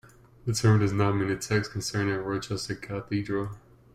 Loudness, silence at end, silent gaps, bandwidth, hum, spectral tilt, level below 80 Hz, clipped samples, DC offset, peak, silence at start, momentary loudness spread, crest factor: -28 LUFS; 0.35 s; none; 14.5 kHz; none; -5.5 dB/octave; -54 dBFS; under 0.1%; under 0.1%; -10 dBFS; 0.45 s; 11 LU; 18 dB